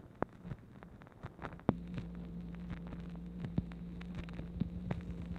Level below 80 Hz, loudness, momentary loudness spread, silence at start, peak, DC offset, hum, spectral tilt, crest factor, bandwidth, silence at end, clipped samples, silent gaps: -52 dBFS; -44 LUFS; 12 LU; 0 s; -10 dBFS; under 0.1%; none; -9 dB/octave; 32 dB; 7.2 kHz; 0 s; under 0.1%; none